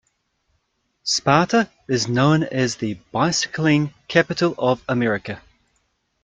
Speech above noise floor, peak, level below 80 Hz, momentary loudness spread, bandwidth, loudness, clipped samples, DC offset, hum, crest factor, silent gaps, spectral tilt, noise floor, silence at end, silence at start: 50 dB; -2 dBFS; -56 dBFS; 9 LU; 9.4 kHz; -20 LUFS; under 0.1%; under 0.1%; none; 20 dB; none; -4.5 dB/octave; -70 dBFS; 0.85 s; 1.05 s